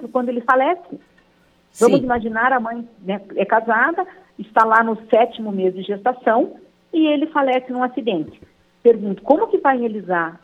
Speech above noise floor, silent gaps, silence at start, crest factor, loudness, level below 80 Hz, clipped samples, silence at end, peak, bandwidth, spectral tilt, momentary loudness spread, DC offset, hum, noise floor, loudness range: 39 dB; none; 0 s; 18 dB; -18 LUFS; -56 dBFS; under 0.1%; 0.1 s; -2 dBFS; 13.5 kHz; -5.5 dB/octave; 11 LU; under 0.1%; none; -57 dBFS; 2 LU